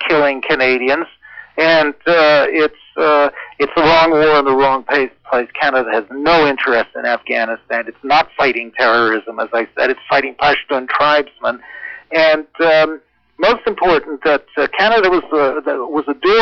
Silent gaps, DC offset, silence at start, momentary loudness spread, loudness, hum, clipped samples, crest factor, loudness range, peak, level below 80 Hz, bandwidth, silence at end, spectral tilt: none; under 0.1%; 0 s; 8 LU; -14 LUFS; none; under 0.1%; 10 dB; 3 LU; -4 dBFS; -48 dBFS; 6.6 kHz; 0 s; -5.5 dB/octave